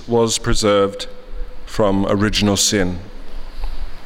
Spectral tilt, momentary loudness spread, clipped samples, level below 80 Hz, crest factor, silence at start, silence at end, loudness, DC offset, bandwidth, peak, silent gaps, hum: -4 dB/octave; 22 LU; under 0.1%; -28 dBFS; 14 dB; 0 s; 0 s; -17 LUFS; under 0.1%; 16 kHz; -4 dBFS; none; none